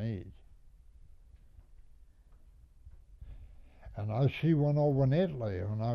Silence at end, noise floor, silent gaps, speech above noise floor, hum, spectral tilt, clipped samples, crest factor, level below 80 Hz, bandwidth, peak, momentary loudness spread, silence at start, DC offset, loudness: 0 s; -58 dBFS; none; 29 dB; none; -10 dB/octave; under 0.1%; 16 dB; -54 dBFS; 5.8 kHz; -18 dBFS; 25 LU; 0 s; under 0.1%; -31 LUFS